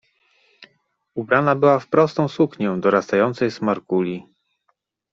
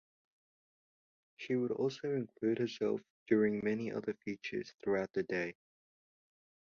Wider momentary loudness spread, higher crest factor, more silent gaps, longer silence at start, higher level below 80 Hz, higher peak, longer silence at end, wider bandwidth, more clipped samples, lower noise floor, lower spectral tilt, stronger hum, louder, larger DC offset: about the same, 10 LU vs 9 LU; about the same, 20 dB vs 20 dB; second, none vs 3.10-3.26 s; second, 0.6 s vs 1.4 s; first, -64 dBFS vs -76 dBFS; first, 0 dBFS vs -18 dBFS; second, 0.9 s vs 1.15 s; about the same, 7.6 kHz vs 7 kHz; neither; second, -70 dBFS vs under -90 dBFS; first, -7.5 dB/octave vs -5.5 dB/octave; neither; first, -19 LUFS vs -37 LUFS; neither